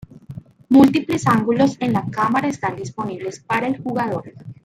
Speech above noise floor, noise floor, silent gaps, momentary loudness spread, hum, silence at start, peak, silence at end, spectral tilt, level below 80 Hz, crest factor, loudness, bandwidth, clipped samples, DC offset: 19 dB; -38 dBFS; none; 22 LU; none; 0.15 s; -2 dBFS; 0.1 s; -6.5 dB/octave; -56 dBFS; 18 dB; -19 LUFS; 14.5 kHz; under 0.1%; under 0.1%